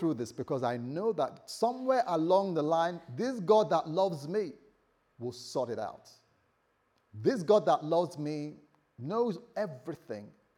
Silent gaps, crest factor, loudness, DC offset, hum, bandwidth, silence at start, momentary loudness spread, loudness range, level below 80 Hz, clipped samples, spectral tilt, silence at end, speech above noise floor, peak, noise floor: none; 18 dB; -31 LUFS; under 0.1%; none; 14 kHz; 0 s; 15 LU; 7 LU; -80 dBFS; under 0.1%; -6.5 dB/octave; 0.3 s; 43 dB; -14 dBFS; -74 dBFS